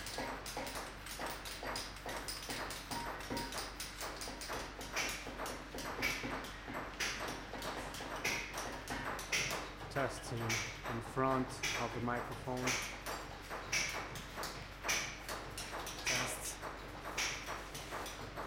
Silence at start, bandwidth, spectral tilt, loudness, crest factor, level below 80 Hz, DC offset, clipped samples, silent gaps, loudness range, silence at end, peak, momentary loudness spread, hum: 0 s; 17 kHz; -2.5 dB/octave; -40 LUFS; 22 dB; -56 dBFS; under 0.1%; under 0.1%; none; 4 LU; 0 s; -20 dBFS; 8 LU; none